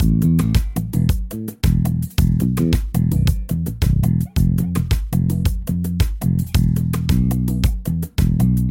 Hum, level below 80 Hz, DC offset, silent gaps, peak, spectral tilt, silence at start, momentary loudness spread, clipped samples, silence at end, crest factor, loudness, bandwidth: none; -24 dBFS; under 0.1%; none; -4 dBFS; -7 dB/octave; 0 s; 5 LU; under 0.1%; 0 s; 14 dB; -19 LUFS; 17 kHz